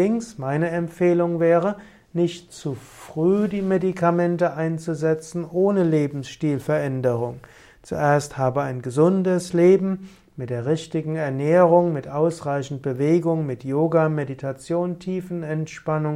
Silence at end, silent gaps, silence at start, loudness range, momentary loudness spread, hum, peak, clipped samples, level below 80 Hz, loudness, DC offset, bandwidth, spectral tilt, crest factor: 0 s; none; 0 s; 3 LU; 12 LU; none; -4 dBFS; under 0.1%; -58 dBFS; -22 LUFS; under 0.1%; 13 kHz; -7.5 dB/octave; 18 dB